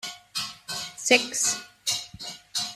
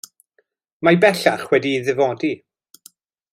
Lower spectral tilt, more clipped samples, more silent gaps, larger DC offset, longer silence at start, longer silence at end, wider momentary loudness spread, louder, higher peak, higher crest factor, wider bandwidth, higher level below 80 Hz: second, 0 dB/octave vs -5.5 dB/octave; neither; neither; neither; second, 0.05 s vs 0.8 s; second, 0 s vs 0.95 s; first, 13 LU vs 10 LU; second, -26 LUFS vs -18 LUFS; about the same, -4 dBFS vs -2 dBFS; first, 26 dB vs 18 dB; about the same, 16 kHz vs 16 kHz; about the same, -66 dBFS vs -64 dBFS